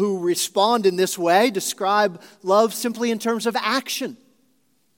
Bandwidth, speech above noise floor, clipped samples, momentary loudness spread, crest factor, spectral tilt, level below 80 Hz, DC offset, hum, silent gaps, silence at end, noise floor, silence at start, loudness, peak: 17 kHz; 45 dB; under 0.1%; 6 LU; 18 dB; -3 dB/octave; -82 dBFS; under 0.1%; none; none; 0.85 s; -66 dBFS; 0 s; -21 LUFS; -4 dBFS